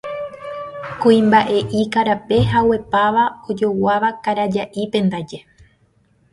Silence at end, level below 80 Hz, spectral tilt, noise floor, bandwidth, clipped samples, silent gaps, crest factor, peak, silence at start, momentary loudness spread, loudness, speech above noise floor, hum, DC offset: 0.9 s; -46 dBFS; -7 dB/octave; -58 dBFS; 11.5 kHz; under 0.1%; none; 16 dB; -2 dBFS; 0.05 s; 15 LU; -17 LUFS; 41 dB; none; under 0.1%